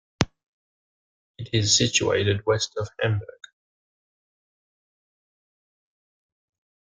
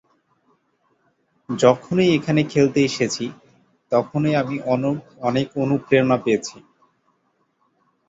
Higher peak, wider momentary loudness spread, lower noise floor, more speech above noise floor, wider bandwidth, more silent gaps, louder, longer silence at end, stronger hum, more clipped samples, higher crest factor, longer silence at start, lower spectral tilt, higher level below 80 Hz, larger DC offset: about the same, 0 dBFS vs -2 dBFS; first, 11 LU vs 8 LU; first, under -90 dBFS vs -67 dBFS; first, over 67 dB vs 48 dB; first, 9.6 kHz vs 8 kHz; first, 0.43-1.34 s vs none; second, -23 LUFS vs -20 LUFS; first, 3.65 s vs 1.5 s; neither; neither; first, 28 dB vs 20 dB; second, 0.2 s vs 1.5 s; second, -3.5 dB/octave vs -6 dB/octave; about the same, -56 dBFS vs -60 dBFS; neither